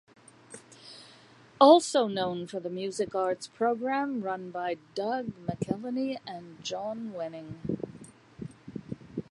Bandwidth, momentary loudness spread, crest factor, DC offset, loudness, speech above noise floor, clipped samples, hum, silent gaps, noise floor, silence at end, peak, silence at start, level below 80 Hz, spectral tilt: 11.5 kHz; 24 LU; 24 dB; under 0.1%; -29 LUFS; 27 dB; under 0.1%; none; none; -55 dBFS; 0.1 s; -6 dBFS; 0.5 s; -66 dBFS; -5 dB/octave